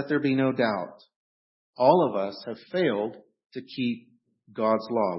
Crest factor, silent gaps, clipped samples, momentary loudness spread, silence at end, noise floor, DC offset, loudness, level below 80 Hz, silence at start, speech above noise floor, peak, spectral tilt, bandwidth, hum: 22 dB; 1.16-1.73 s, 3.46-3.50 s; under 0.1%; 18 LU; 0 s; under -90 dBFS; under 0.1%; -26 LUFS; -76 dBFS; 0 s; over 64 dB; -6 dBFS; -10.5 dB/octave; 5.8 kHz; none